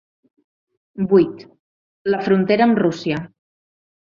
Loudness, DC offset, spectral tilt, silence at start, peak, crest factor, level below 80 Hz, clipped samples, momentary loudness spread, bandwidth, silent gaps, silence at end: -18 LUFS; under 0.1%; -7.5 dB/octave; 0.95 s; -2 dBFS; 18 dB; -60 dBFS; under 0.1%; 21 LU; 7.2 kHz; 1.59-2.05 s; 0.9 s